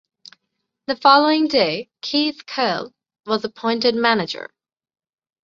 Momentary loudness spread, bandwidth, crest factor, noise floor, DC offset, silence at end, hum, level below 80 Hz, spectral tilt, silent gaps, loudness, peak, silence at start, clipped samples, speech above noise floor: 18 LU; 7.4 kHz; 20 dB; -77 dBFS; under 0.1%; 1 s; none; -66 dBFS; -4.5 dB/octave; none; -19 LUFS; 0 dBFS; 0.9 s; under 0.1%; 58 dB